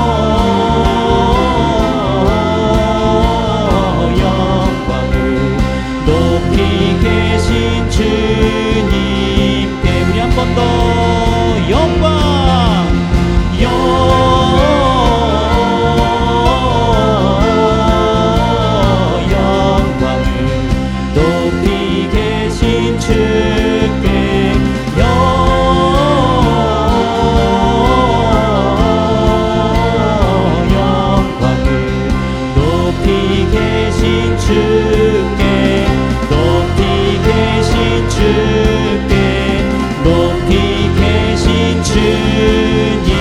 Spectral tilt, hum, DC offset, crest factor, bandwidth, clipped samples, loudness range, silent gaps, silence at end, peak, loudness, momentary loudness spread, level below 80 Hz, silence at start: -6.5 dB/octave; none; under 0.1%; 12 dB; 14 kHz; under 0.1%; 2 LU; none; 0 s; 0 dBFS; -12 LUFS; 3 LU; -18 dBFS; 0 s